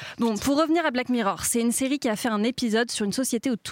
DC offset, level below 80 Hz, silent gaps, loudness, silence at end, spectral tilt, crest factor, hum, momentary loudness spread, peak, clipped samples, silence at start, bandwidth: under 0.1%; -56 dBFS; none; -24 LUFS; 0 s; -3.5 dB/octave; 12 dB; none; 3 LU; -12 dBFS; under 0.1%; 0 s; 17 kHz